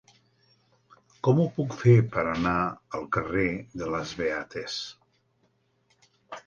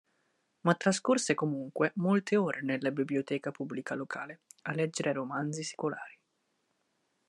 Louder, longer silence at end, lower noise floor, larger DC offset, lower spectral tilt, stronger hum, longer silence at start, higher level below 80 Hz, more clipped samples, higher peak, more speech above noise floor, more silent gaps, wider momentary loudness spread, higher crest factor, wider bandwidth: first, -27 LUFS vs -32 LUFS; second, 0.05 s vs 1.15 s; second, -70 dBFS vs -78 dBFS; neither; first, -7 dB/octave vs -5 dB/octave; neither; first, 1.25 s vs 0.65 s; first, -54 dBFS vs -82 dBFS; neither; first, -8 dBFS vs -12 dBFS; about the same, 44 dB vs 46 dB; neither; about the same, 13 LU vs 11 LU; about the same, 20 dB vs 22 dB; second, 7.2 kHz vs 11.5 kHz